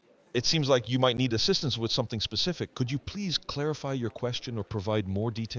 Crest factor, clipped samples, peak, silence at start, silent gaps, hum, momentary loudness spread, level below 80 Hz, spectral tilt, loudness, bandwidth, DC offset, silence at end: 18 dB; under 0.1%; -10 dBFS; 0.35 s; none; none; 8 LU; -52 dBFS; -5 dB/octave; -29 LUFS; 7.6 kHz; under 0.1%; 0 s